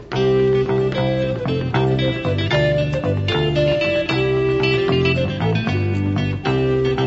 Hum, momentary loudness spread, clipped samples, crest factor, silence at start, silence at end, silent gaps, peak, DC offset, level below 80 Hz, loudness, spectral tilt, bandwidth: none; 4 LU; under 0.1%; 14 dB; 0 s; 0 s; none; -4 dBFS; under 0.1%; -38 dBFS; -19 LUFS; -7.5 dB/octave; 7.8 kHz